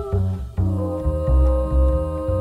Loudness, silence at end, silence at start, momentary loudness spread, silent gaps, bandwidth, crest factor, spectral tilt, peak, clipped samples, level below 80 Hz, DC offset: -21 LUFS; 0 s; 0 s; 5 LU; none; 4.1 kHz; 12 dB; -10 dB/octave; -8 dBFS; under 0.1%; -22 dBFS; under 0.1%